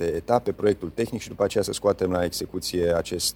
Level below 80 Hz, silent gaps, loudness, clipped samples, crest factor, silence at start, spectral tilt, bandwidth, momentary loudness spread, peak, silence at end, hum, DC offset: -48 dBFS; none; -25 LUFS; under 0.1%; 18 dB; 0 s; -4.5 dB/octave; 20 kHz; 5 LU; -6 dBFS; 0.05 s; none; under 0.1%